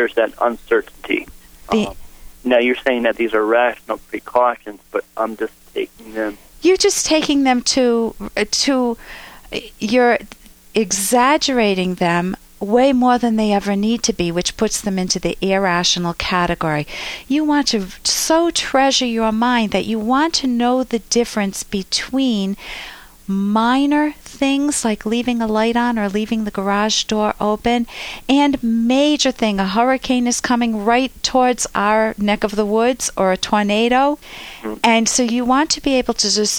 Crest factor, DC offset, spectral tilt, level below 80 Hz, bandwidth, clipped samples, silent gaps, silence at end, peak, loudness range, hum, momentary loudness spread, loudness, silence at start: 14 dB; under 0.1%; -3.5 dB/octave; -44 dBFS; over 20 kHz; under 0.1%; none; 0 s; -2 dBFS; 3 LU; none; 11 LU; -17 LUFS; 0 s